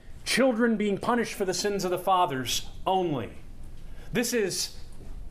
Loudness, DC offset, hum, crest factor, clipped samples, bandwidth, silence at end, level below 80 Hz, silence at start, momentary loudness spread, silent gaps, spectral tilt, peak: -27 LUFS; under 0.1%; none; 18 dB; under 0.1%; 15.5 kHz; 0 s; -44 dBFS; 0.05 s; 10 LU; none; -3.5 dB/octave; -10 dBFS